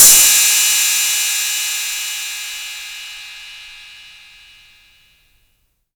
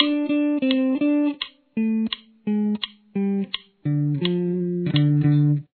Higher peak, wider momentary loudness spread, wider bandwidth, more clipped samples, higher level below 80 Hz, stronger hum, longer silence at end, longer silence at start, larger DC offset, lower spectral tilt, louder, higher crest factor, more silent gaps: about the same, 0 dBFS vs -2 dBFS; first, 24 LU vs 10 LU; first, over 20 kHz vs 4.5 kHz; neither; first, -52 dBFS vs -64 dBFS; neither; first, 1.95 s vs 0.1 s; about the same, 0 s vs 0 s; neither; second, 3.5 dB/octave vs -11 dB/octave; first, -12 LUFS vs -23 LUFS; about the same, 18 dB vs 20 dB; neither